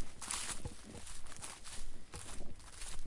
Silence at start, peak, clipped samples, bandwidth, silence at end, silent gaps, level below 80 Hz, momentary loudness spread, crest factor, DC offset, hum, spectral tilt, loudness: 0 s; -20 dBFS; under 0.1%; 11.5 kHz; 0 s; none; -48 dBFS; 11 LU; 20 dB; under 0.1%; none; -2 dB/octave; -46 LUFS